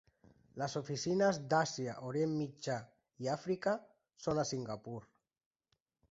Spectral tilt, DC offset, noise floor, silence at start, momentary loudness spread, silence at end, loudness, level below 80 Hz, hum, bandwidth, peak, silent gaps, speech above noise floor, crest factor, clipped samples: -5 dB/octave; under 0.1%; -83 dBFS; 0.55 s; 11 LU; 1.1 s; -37 LUFS; -72 dBFS; none; 8 kHz; -18 dBFS; none; 47 dB; 20 dB; under 0.1%